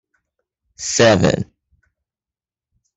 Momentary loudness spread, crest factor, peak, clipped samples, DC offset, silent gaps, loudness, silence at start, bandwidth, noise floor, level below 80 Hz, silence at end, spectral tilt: 16 LU; 20 dB; -2 dBFS; under 0.1%; under 0.1%; none; -16 LUFS; 0.8 s; 8.4 kHz; under -90 dBFS; -50 dBFS; 1.55 s; -4 dB/octave